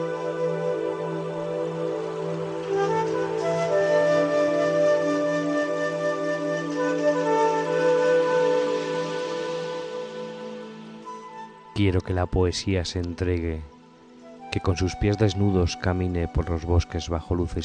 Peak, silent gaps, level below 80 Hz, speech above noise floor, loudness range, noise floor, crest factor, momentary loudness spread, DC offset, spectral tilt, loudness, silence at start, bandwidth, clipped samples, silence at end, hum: -8 dBFS; none; -40 dBFS; 25 dB; 5 LU; -49 dBFS; 16 dB; 13 LU; under 0.1%; -6 dB/octave; -25 LUFS; 0 s; 9.8 kHz; under 0.1%; 0 s; none